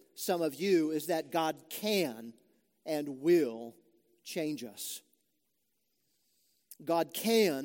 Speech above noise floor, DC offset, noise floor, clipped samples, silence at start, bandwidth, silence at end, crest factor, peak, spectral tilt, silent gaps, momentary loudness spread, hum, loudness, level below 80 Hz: 49 dB; under 0.1%; -81 dBFS; under 0.1%; 0.15 s; 17 kHz; 0 s; 20 dB; -14 dBFS; -4.5 dB/octave; none; 18 LU; none; -32 LUFS; -88 dBFS